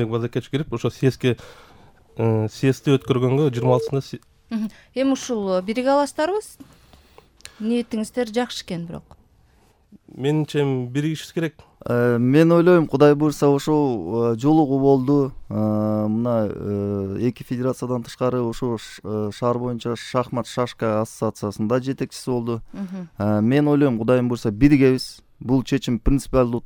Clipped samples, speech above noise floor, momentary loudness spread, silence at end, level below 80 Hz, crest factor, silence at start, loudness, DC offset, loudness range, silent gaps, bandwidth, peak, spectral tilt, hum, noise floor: under 0.1%; 37 dB; 12 LU; 0.05 s; -42 dBFS; 20 dB; 0 s; -21 LUFS; under 0.1%; 8 LU; none; 18.5 kHz; -2 dBFS; -7 dB/octave; none; -57 dBFS